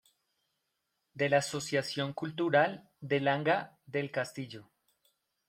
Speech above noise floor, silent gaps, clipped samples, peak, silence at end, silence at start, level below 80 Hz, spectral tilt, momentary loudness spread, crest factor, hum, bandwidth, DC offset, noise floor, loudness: 51 dB; none; under 0.1%; -12 dBFS; 0.85 s; 1.15 s; -76 dBFS; -5 dB/octave; 13 LU; 22 dB; none; 16 kHz; under 0.1%; -82 dBFS; -32 LUFS